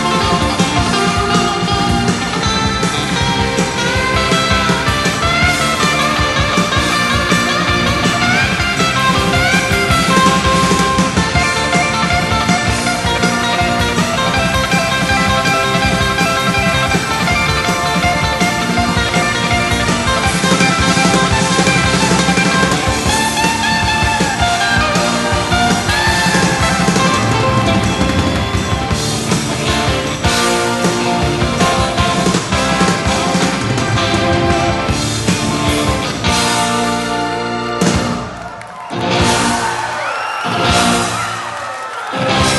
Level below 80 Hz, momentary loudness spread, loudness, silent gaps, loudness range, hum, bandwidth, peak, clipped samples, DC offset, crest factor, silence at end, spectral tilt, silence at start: -28 dBFS; 4 LU; -13 LUFS; none; 3 LU; none; 13 kHz; 0 dBFS; under 0.1%; under 0.1%; 14 dB; 0 s; -4 dB/octave; 0 s